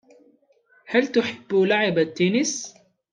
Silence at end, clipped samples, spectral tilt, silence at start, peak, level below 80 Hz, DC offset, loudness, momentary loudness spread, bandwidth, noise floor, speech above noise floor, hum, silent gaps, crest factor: 0.4 s; under 0.1%; -4 dB/octave; 0.9 s; -4 dBFS; -70 dBFS; under 0.1%; -22 LUFS; 6 LU; 10 kHz; -61 dBFS; 39 dB; none; none; 18 dB